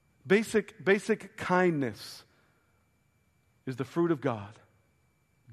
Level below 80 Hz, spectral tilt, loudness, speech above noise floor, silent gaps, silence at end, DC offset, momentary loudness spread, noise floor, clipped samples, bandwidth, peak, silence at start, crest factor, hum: -70 dBFS; -6 dB/octave; -29 LUFS; 41 dB; none; 0 s; under 0.1%; 18 LU; -70 dBFS; under 0.1%; 13 kHz; -10 dBFS; 0.25 s; 22 dB; none